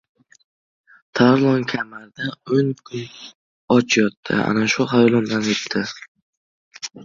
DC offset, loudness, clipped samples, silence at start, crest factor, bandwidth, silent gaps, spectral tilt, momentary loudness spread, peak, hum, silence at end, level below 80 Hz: under 0.1%; -19 LUFS; under 0.1%; 1.15 s; 20 dB; 7.6 kHz; 3.35-3.68 s, 4.17-4.23 s, 6.08-6.15 s, 6.22-6.71 s; -5 dB/octave; 16 LU; -2 dBFS; none; 0 s; -60 dBFS